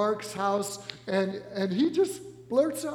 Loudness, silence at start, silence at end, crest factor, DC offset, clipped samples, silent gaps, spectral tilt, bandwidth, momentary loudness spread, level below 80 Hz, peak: -29 LUFS; 0 s; 0 s; 16 dB; under 0.1%; under 0.1%; none; -5 dB/octave; 17.5 kHz; 8 LU; -70 dBFS; -12 dBFS